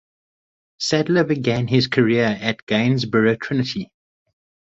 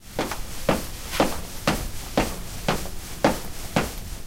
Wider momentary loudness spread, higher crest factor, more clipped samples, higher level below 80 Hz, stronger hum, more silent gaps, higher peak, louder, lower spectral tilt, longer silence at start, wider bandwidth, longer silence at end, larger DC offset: about the same, 8 LU vs 6 LU; about the same, 18 dB vs 22 dB; neither; second, -56 dBFS vs -36 dBFS; neither; first, 2.62-2.67 s vs none; about the same, -4 dBFS vs -6 dBFS; first, -19 LUFS vs -27 LUFS; first, -6 dB/octave vs -4 dB/octave; first, 0.8 s vs 0 s; second, 8 kHz vs 16.5 kHz; first, 0.85 s vs 0 s; neither